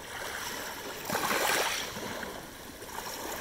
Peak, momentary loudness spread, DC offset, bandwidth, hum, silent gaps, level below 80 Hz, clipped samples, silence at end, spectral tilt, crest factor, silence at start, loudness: -12 dBFS; 14 LU; under 0.1%; over 20 kHz; none; none; -58 dBFS; under 0.1%; 0 s; -1.5 dB/octave; 22 dB; 0 s; -33 LUFS